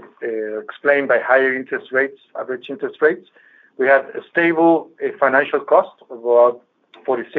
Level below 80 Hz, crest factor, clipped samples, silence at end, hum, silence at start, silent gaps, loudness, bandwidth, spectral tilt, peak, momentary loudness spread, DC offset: -80 dBFS; 18 dB; under 0.1%; 0 s; none; 0.05 s; none; -18 LUFS; 4.5 kHz; -3 dB/octave; 0 dBFS; 13 LU; under 0.1%